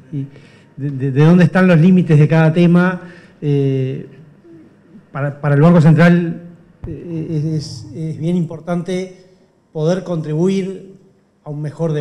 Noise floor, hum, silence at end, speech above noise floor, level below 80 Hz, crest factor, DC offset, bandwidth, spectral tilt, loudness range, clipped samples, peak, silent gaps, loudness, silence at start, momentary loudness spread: -51 dBFS; none; 0 s; 37 dB; -50 dBFS; 12 dB; under 0.1%; 9.2 kHz; -8.5 dB/octave; 9 LU; under 0.1%; -2 dBFS; none; -14 LUFS; 0.1 s; 20 LU